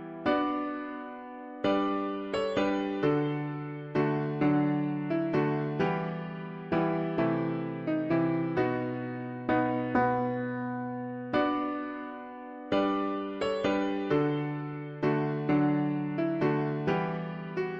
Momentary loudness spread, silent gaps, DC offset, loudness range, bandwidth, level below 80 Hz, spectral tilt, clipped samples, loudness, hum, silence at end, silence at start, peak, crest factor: 9 LU; none; under 0.1%; 2 LU; 7.8 kHz; -62 dBFS; -8.5 dB/octave; under 0.1%; -30 LUFS; none; 0 s; 0 s; -14 dBFS; 14 dB